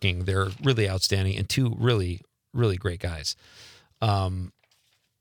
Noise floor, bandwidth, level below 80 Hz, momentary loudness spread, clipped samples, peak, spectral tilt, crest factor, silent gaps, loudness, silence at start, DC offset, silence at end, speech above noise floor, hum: -68 dBFS; 19 kHz; -52 dBFS; 12 LU; under 0.1%; -8 dBFS; -5 dB/octave; 18 dB; none; -26 LUFS; 0 s; under 0.1%; 0.7 s; 43 dB; none